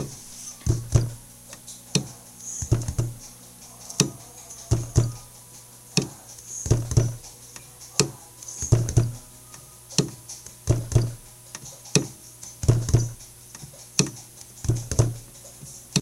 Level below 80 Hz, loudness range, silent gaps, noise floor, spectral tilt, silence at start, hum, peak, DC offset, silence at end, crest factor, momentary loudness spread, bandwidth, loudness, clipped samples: -38 dBFS; 2 LU; none; -46 dBFS; -4.5 dB/octave; 0 s; none; 0 dBFS; under 0.1%; 0 s; 28 dB; 19 LU; 16 kHz; -26 LUFS; under 0.1%